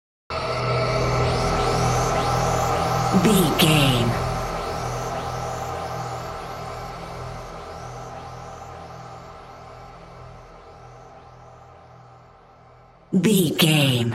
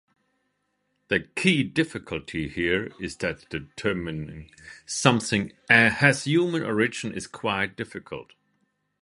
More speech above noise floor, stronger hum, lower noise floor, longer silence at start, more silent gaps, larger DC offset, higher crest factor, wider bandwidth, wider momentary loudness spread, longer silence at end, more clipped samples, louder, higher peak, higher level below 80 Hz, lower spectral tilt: second, 32 dB vs 49 dB; neither; second, -50 dBFS vs -75 dBFS; second, 0.3 s vs 1.1 s; neither; neither; second, 20 dB vs 26 dB; first, 16 kHz vs 11.5 kHz; first, 24 LU vs 17 LU; second, 0 s vs 0.8 s; neither; about the same, -22 LUFS vs -24 LUFS; about the same, -4 dBFS vs -2 dBFS; first, -40 dBFS vs -54 dBFS; about the same, -5 dB/octave vs -4.5 dB/octave